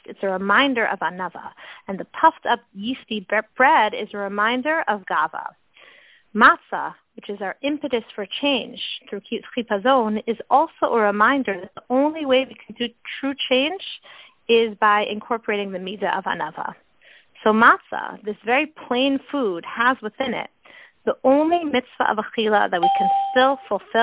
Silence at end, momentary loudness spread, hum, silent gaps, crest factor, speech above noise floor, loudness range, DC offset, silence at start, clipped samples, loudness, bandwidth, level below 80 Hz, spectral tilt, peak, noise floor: 0 s; 14 LU; none; none; 20 dB; 32 dB; 3 LU; under 0.1%; 0.1 s; under 0.1%; -21 LUFS; 4 kHz; -64 dBFS; -8 dB/octave; -2 dBFS; -53 dBFS